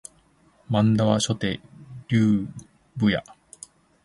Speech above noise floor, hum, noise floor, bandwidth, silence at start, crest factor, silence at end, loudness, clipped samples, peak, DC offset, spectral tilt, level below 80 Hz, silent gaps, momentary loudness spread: 38 dB; none; -60 dBFS; 11.5 kHz; 0.7 s; 20 dB; 0.85 s; -23 LUFS; under 0.1%; -6 dBFS; under 0.1%; -6 dB/octave; -54 dBFS; none; 23 LU